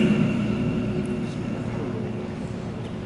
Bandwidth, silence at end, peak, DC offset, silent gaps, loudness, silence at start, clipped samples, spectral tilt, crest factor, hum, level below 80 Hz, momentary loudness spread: 11 kHz; 0 s; -8 dBFS; under 0.1%; none; -27 LUFS; 0 s; under 0.1%; -7.5 dB/octave; 16 dB; none; -46 dBFS; 9 LU